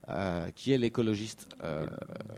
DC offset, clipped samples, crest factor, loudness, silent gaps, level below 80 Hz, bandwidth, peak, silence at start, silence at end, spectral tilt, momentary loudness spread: under 0.1%; under 0.1%; 18 dB; -33 LUFS; none; -60 dBFS; 15.5 kHz; -14 dBFS; 0.05 s; 0 s; -6.5 dB/octave; 13 LU